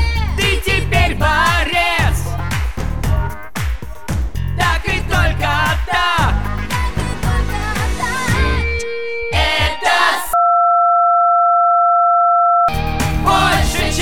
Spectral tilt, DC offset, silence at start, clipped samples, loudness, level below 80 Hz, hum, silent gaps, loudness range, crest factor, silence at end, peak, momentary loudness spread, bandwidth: -4.5 dB/octave; 4%; 0 s; under 0.1%; -15 LUFS; -22 dBFS; none; none; 6 LU; 14 dB; 0 s; 0 dBFS; 10 LU; 18 kHz